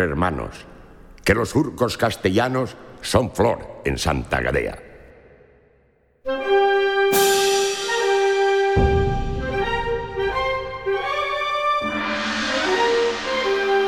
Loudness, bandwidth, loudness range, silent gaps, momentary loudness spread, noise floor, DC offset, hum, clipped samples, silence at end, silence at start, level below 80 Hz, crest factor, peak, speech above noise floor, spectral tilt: -21 LUFS; 19 kHz; 5 LU; none; 8 LU; -59 dBFS; under 0.1%; none; under 0.1%; 0 s; 0 s; -36 dBFS; 22 dB; 0 dBFS; 38 dB; -4.5 dB/octave